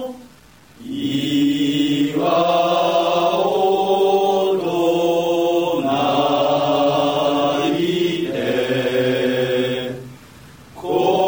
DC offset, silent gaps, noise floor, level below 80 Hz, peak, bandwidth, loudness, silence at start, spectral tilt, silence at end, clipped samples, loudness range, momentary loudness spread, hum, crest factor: 0.1%; none; -47 dBFS; -58 dBFS; -4 dBFS; over 20 kHz; -18 LUFS; 0 s; -5.5 dB/octave; 0 s; under 0.1%; 3 LU; 6 LU; none; 14 dB